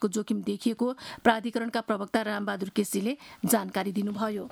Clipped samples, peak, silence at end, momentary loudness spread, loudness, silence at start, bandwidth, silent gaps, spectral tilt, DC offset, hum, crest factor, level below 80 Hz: under 0.1%; -6 dBFS; 0 s; 6 LU; -29 LUFS; 0 s; 19.5 kHz; none; -4.5 dB/octave; under 0.1%; none; 24 dB; -66 dBFS